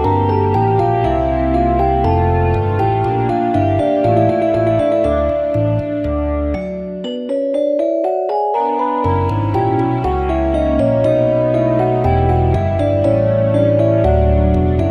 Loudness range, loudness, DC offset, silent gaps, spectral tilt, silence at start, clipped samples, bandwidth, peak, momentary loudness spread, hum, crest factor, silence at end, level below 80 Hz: 4 LU; -15 LUFS; under 0.1%; none; -9.5 dB/octave; 0 s; under 0.1%; 9.2 kHz; -2 dBFS; 5 LU; none; 14 dB; 0 s; -26 dBFS